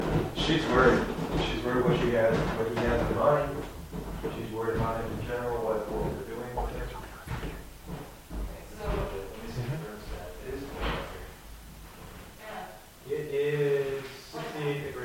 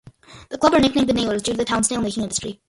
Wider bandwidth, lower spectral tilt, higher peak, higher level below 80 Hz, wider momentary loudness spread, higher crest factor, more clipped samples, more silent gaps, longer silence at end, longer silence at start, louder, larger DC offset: first, 16.5 kHz vs 11.5 kHz; first, -6 dB/octave vs -3.5 dB/octave; second, -10 dBFS vs -2 dBFS; about the same, -42 dBFS vs -44 dBFS; first, 17 LU vs 8 LU; about the same, 22 dB vs 20 dB; neither; neither; second, 0 s vs 0.15 s; second, 0 s vs 0.3 s; second, -30 LUFS vs -20 LUFS; neither